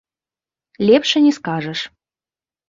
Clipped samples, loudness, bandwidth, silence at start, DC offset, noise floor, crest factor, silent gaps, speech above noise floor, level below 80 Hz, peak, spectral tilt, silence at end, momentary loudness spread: under 0.1%; -16 LUFS; 7.6 kHz; 0.8 s; under 0.1%; under -90 dBFS; 18 dB; none; over 74 dB; -62 dBFS; -2 dBFS; -5 dB/octave; 0.8 s; 13 LU